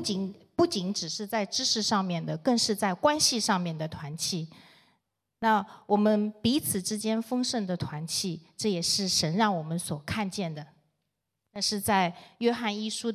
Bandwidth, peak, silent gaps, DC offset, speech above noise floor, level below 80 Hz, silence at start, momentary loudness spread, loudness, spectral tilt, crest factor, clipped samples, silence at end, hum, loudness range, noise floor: 15.5 kHz; -10 dBFS; none; under 0.1%; 54 dB; -60 dBFS; 0 s; 9 LU; -28 LUFS; -3.5 dB/octave; 20 dB; under 0.1%; 0 s; none; 3 LU; -82 dBFS